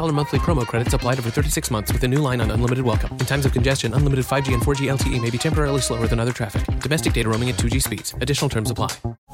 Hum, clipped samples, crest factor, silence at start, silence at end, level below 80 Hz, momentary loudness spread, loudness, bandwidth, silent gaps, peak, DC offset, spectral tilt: none; under 0.1%; 14 dB; 0 s; 0 s; -30 dBFS; 4 LU; -21 LUFS; 16.5 kHz; 9.18-9.27 s; -6 dBFS; under 0.1%; -5 dB/octave